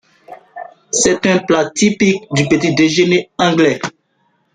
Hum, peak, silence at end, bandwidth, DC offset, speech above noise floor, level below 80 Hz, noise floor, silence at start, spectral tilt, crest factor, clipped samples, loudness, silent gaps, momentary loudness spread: none; -2 dBFS; 0.65 s; 9.6 kHz; under 0.1%; 48 dB; -52 dBFS; -61 dBFS; 0.3 s; -4 dB/octave; 14 dB; under 0.1%; -14 LUFS; none; 17 LU